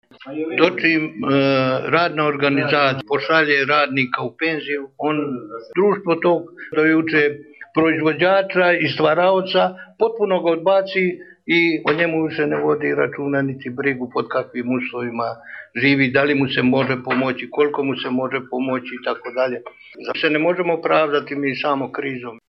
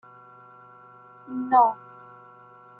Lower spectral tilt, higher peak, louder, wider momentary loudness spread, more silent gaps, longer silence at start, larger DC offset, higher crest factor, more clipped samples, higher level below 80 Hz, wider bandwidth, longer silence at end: second, -7.5 dB/octave vs -9 dB/octave; first, 0 dBFS vs -6 dBFS; first, -19 LUFS vs -22 LUFS; second, 9 LU vs 27 LU; neither; second, 0.2 s vs 1.3 s; neither; about the same, 18 dB vs 22 dB; neither; first, -64 dBFS vs -80 dBFS; first, 6.2 kHz vs 4.3 kHz; second, 0.15 s vs 1.05 s